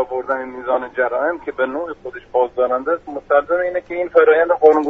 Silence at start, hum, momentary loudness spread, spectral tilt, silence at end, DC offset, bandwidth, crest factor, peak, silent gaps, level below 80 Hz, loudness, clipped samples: 0 s; none; 11 LU; -2.5 dB/octave; 0 s; under 0.1%; 4 kHz; 16 dB; 0 dBFS; none; -54 dBFS; -18 LUFS; under 0.1%